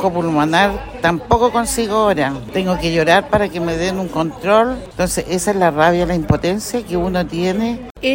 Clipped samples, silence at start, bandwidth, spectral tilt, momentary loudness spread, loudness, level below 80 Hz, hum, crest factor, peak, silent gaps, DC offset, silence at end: under 0.1%; 0 s; 16.5 kHz; -5 dB/octave; 7 LU; -17 LUFS; -36 dBFS; none; 16 dB; 0 dBFS; 7.91-7.95 s; under 0.1%; 0 s